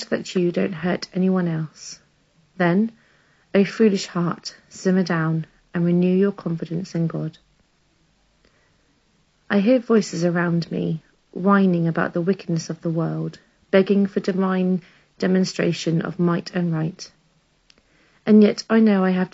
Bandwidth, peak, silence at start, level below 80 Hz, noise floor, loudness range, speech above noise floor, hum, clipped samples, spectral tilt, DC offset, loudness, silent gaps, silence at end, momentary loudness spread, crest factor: 8 kHz; -2 dBFS; 0 s; -64 dBFS; -62 dBFS; 4 LU; 42 dB; none; under 0.1%; -6.5 dB/octave; under 0.1%; -21 LUFS; none; 0.05 s; 12 LU; 18 dB